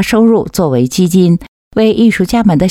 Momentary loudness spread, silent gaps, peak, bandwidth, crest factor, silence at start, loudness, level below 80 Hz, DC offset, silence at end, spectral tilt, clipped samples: 4 LU; 1.48-1.71 s; 0 dBFS; 16.5 kHz; 10 dB; 0 s; -11 LUFS; -36 dBFS; under 0.1%; 0 s; -6.5 dB/octave; under 0.1%